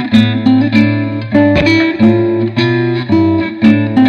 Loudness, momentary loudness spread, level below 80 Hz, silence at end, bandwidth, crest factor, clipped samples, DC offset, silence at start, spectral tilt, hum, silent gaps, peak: -11 LUFS; 4 LU; -40 dBFS; 0 s; 7 kHz; 10 dB; under 0.1%; under 0.1%; 0 s; -7.5 dB/octave; none; none; 0 dBFS